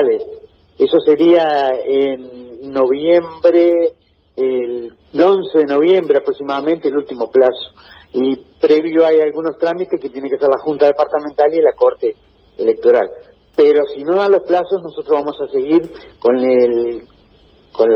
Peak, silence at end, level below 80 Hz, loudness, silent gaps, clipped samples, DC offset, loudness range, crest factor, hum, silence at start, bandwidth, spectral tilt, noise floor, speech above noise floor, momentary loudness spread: 0 dBFS; 0 s; -56 dBFS; -15 LUFS; none; under 0.1%; under 0.1%; 2 LU; 14 dB; none; 0 s; 5.8 kHz; -7.5 dB/octave; -49 dBFS; 35 dB; 11 LU